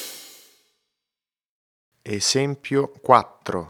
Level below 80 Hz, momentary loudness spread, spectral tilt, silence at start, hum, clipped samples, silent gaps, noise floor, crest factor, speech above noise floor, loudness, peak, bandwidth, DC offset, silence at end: -68 dBFS; 15 LU; -3.5 dB/octave; 0 s; none; under 0.1%; 1.45-1.92 s; -90 dBFS; 24 dB; 68 dB; -21 LUFS; 0 dBFS; over 20 kHz; under 0.1%; 0 s